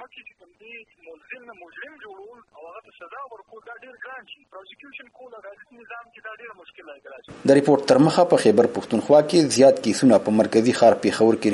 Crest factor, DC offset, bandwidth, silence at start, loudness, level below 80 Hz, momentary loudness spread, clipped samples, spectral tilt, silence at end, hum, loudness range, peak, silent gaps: 18 dB; under 0.1%; 11.5 kHz; 0 s; -18 LUFS; -66 dBFS; 25 LU; under 0.1%; -5.5 dB/octave; 0 s; none; 24 LU; -4 dBFS; none